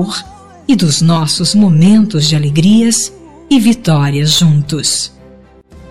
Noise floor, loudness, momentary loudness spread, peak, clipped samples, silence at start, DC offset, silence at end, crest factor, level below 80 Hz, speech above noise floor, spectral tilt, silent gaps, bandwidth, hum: -39 dBFS; -10 LUFS; 9 LU; -2 dBFS; under 0.1%; 0 s; 2%; 0 s; 10 dB; -44 dBFS; 30 dB; -5 dB/octave; none; 15.5 kHz; none